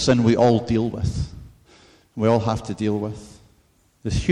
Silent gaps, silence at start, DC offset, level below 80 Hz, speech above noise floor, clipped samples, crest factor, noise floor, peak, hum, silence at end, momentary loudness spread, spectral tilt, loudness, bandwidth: none; 0 s; under 0.1%; -38 dBFS; 40 dB; under 0.1%; 16 dB; -60 dBFS; -6 dBFS; none; 0 s; 16 LU; -6.5 dB/octave; -22 LUFS; 11 kHz